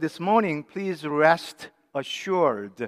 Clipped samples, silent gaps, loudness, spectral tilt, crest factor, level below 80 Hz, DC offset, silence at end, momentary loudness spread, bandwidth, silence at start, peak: under 0.1%; none; -24 LUFS; -5.5 dB/octave; 20 dB; -80 dBFS; under 0.1%; 0 s; 13 LU; 15.5 kHz; 0 s; -4 dBFS